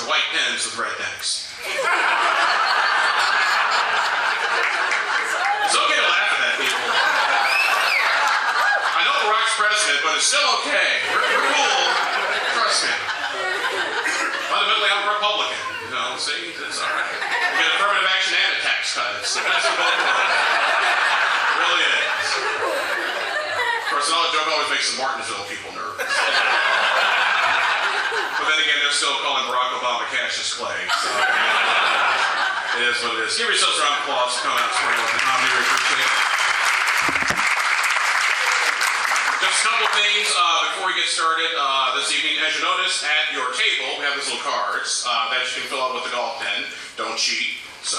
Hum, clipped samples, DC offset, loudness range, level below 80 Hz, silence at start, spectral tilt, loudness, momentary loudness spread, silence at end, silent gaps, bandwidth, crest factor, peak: none; under 0.1%; under 0.1%; 3 LU; -68 dBFS; 0 s; 1 dB/octave; -19 LUFS; 7 LU; 0 s; none; 15 kHz; 16 dB; -4 dBFS